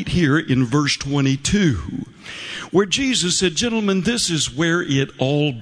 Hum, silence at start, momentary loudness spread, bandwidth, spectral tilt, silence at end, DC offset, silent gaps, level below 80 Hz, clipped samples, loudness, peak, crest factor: none; 0 s; 11 LU; 11 kHz; -4.5 dB/octave; 0 s; under 0.1%; none; -40 dBFS; under 0.1%; -19 LUFS; -4 dBFS; 16 dB